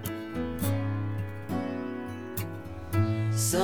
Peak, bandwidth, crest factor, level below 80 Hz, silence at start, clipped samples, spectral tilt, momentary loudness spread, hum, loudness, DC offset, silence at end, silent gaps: -14 dBFS; over 20 kHz; 18 dB; -52 dBFS; 0 s; under 0.1%; -5.5 dB/octave; 9 LU; none; -32 LUFS; 0.3%; 0 s; none